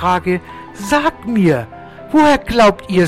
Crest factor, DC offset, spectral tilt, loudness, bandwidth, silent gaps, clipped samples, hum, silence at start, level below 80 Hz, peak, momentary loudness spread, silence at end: 12 dB; under 0.1%; -6 dB/octave; -14 LUFS; 15 kHz; none; under 0.1%; none; 0 s; -38 dBFS; -4 dBFS; 18 LU; 0 s